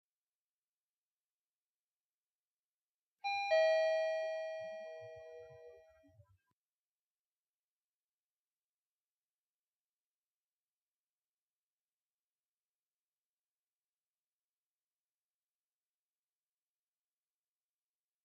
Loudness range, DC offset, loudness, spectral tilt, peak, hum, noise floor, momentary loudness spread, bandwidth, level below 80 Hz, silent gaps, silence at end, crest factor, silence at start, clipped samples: 16 LU; under 0.1%; -36 LUFS; -1.5 dB/octave; -24 dBFS; none; under -90 dBFS; 23 LU; 7.6 kHz; under -90 dBFS; none; 12.45 s; 22 dB; 3.25 s; under 0.1%